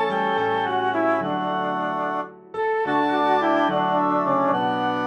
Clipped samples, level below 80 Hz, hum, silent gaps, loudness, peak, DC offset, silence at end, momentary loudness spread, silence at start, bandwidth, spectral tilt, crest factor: under 0.1%; -70 dBFS; none; none; -22 LUFS; -8 dBFS; under 0.1%; 0 s; 5 LU; 0 s; 9.6 kHz; -6.5 dB/octave; 14 dB